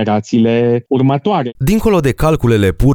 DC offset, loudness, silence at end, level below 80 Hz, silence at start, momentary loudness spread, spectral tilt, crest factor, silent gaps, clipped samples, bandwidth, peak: under 0.1%; -13 LUFS; 0 s; -26 dBFS; 0 s; 3 LU; -7.5 dB/octave; 12 dB; none; under 0.1%; over 20 kHz; 0 dBFS